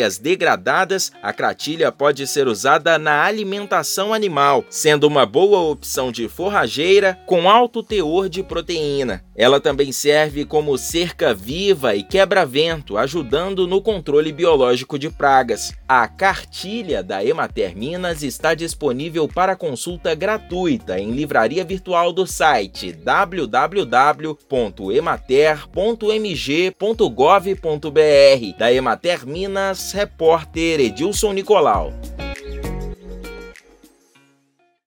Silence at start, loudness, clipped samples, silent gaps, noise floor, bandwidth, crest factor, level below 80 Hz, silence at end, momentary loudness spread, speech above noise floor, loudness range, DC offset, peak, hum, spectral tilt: 0 s; -18 LUFS; under 0.1%; none; -62 dBFS; 19 kHz; 18 dB; -40 dBFS; 1.35 s; 9 LU; 45 dB; 5 LU; under 0.1%; 0 dBFS; none; -4 dB/octave